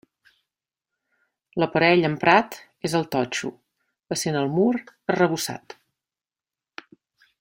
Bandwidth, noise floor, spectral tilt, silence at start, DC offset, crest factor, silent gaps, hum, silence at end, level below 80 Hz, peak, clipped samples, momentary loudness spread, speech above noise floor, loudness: 16 kHz; under -90 dBFS; -5 dB/octave; 1.55 s; under 0.1%; 22 dB; none; none; 1.8 s; -66 dBFS; -2 dBFS; under 0.1%; 19 LU; over 68 dB; -22 LUFS